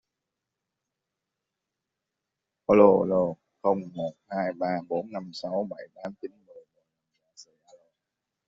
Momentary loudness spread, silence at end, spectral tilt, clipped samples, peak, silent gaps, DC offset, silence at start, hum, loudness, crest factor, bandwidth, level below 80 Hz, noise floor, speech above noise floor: 20 LU; 1.05 s; -6.5 dB/octave; under 0.1%; -6 dBFS; none; under 0.1%; 2.7 s; none; -26 LUFS; 24 dB; 7.6 kHz; -66 dBFS; -86 dBFS; 61 dB